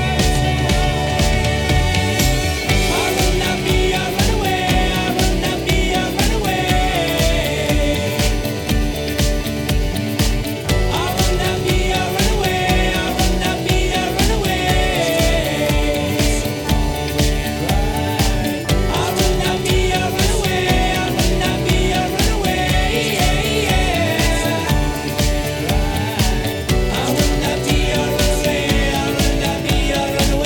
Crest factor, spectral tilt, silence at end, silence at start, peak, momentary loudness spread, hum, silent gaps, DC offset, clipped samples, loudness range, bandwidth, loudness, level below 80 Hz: 14 dB; -4.5 dB/octave; 0 s; 0 s; -2 dBFS; 3 LU; none; none; under 0.1%; under 0.1%; 2 LU; 19 kHz; -17 LUFS; -22 dBFS